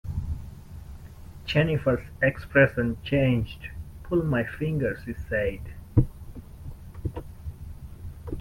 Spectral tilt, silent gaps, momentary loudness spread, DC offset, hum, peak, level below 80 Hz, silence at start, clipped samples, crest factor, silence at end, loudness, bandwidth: -8 dB/octave; none; 21 LU; under 0.1%; none; -6 dBFS; -40 dBFS; 0.05 s; under 0.1%; 22 dB; 0 s; -26 LUFS; 16.5 kHz